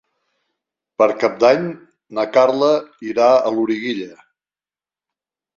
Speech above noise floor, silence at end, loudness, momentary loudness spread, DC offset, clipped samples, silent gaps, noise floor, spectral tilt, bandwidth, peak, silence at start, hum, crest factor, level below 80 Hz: over 74 dB; 1.45 s; -17 LUFS; 15 LU; under 0.1%; under 0.1%; none; under -90 dBFS; -5.5 dB/octave; 7.2 kHz; -2 dBFS; 1 s; none; 18 dB; -64 dBFS